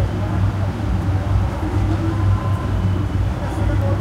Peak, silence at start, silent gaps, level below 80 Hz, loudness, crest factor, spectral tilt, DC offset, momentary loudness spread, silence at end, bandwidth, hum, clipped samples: -6 dBFS; 0 s; none; -26 dBFS; -20 LUFS; 12 dB; -8 dB/octave; under 0.1%; 3 LU; 0 s; 9.2 kHz; none; under 0.1%